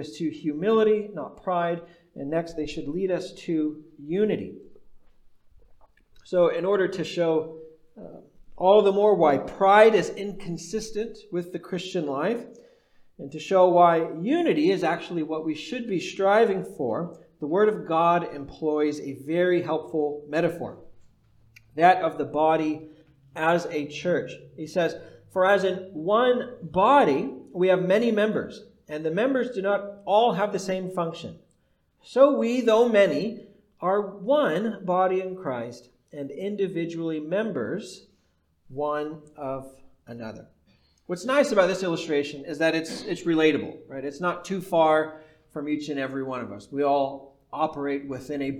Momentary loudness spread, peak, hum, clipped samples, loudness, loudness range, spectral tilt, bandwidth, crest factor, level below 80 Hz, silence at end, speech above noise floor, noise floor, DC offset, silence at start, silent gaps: 17 LU; -4 dBFS; none; under 0.1%; -24 LUFS; 8 LU; -6 dB/octave; 14 kHz; 20 dB; -60 dBFS; 0 s; 43 dB; -68 dBFS; under 0.1%; 0 s; none